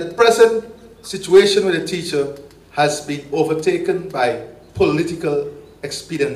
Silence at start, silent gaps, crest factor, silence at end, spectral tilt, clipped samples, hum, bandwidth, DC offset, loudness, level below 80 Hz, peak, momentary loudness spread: 0 s; none; 16 dB; 0 s; -4.5 dB/octave; under 0.1%; none; 14.5 kHz; under 0.1%; -18 LUFS; -52 dBFS; -2 dBFS; 17 LU